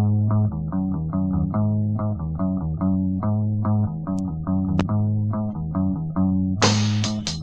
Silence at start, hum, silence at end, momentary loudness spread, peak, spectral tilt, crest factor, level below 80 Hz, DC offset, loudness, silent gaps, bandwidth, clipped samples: 0 s; none; 0 s; 6 LU; -4 dBFS; -6 dB/octave; 18 dB; -40 dBFS; under 0.1%; -23 LUFS; none; 8.6 kHz; under 0.1%